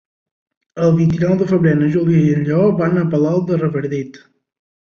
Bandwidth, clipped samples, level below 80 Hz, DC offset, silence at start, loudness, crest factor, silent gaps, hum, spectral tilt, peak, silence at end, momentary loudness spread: 6.8 kHz; under 0.1%; -50 dBFS; under 0.1%; 0.75 s; -16 LUFS; 14 dB; none; none; -9.5 dB/octave; -2 dBFS; 0.7 s; 8 LU